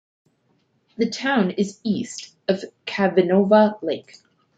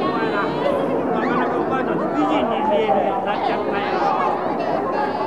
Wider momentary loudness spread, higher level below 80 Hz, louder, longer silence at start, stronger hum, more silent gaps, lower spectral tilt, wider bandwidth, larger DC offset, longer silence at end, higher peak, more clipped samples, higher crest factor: first, 13 LU vs 3 LU; second, -68 dBFS vs -56 dBFS; about the same, -21 LUFS vs -20 LUFS; first, 1 s vs 0 s; neither; neither; about the same, -6 dB/octave vs -7 dB/octave; second, 8.8 kHz vs 12 kHz; second, under 0.1% vs 0.4%; first, 0.55 s vs 0 s; first, -2 dBFS vs -6 dBFS; neither; first, 20 dB vs 14 dB